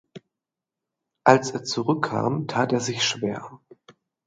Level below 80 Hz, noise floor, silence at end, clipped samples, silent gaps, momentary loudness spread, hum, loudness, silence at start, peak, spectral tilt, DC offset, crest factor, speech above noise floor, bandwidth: -68 dBFS; -87 dBFS; 0.35 s; under 0.1%; none; 11 LU; none; -23 LUFS; 0.15 s; 0 dBFS; -4.5 dB/octave; under 0.1%; 26 dB; 64 dB; 9.6 kHz